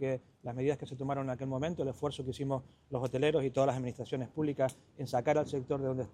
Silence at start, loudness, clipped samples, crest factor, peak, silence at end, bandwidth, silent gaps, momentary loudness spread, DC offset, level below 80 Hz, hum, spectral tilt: 0 s; -35 LUFS; under 0.1%; 18 dB; -16 dBFS; 0 s; 13 kHz; none; 8 LU; under 0.1%; -66 dBFS; none; -7 dB/octave